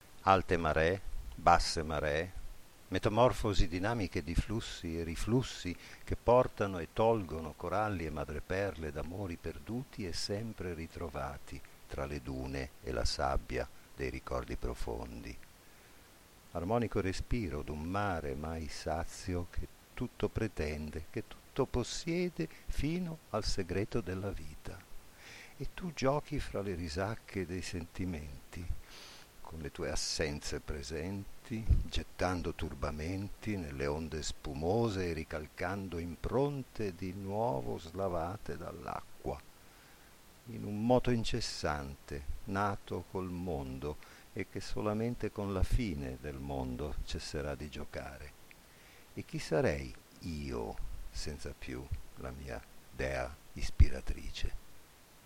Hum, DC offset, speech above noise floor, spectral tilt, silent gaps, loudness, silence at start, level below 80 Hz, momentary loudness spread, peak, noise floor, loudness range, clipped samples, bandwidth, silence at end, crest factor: none; under 0.1%; 23 dB; -5.5 dB/octave; none; -37 LUFS; 0 s; -44 dBFS; 15 LU; -10 dBFS; -59 dBFS; 7 LU; under 0.1%; 16.5 kHz; 0.05 s; 26 dB